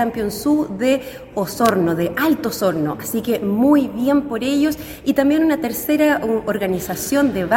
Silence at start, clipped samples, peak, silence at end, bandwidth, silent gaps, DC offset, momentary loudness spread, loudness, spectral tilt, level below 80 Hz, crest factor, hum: 0 s; under 0.1%; 0 dBFS; 0 s; 17 kHz; none; under 0.1%; 6 LU; -19 LUFS; -5 dB/octave; -46 dBFS; 18 dB; none